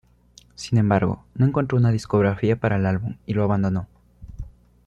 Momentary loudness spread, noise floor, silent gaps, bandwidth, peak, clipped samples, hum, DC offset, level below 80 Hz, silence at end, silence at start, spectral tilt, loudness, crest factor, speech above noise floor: 20 LU; -53 dBFS; none; 9.2 kHz; -6 dBFS; under 0.1%; none; under 0.1%; -46 dBFS; 0.35 s; 0.6 s; -8 dB/octave; -22 LUFS; 16 dB; 33 dB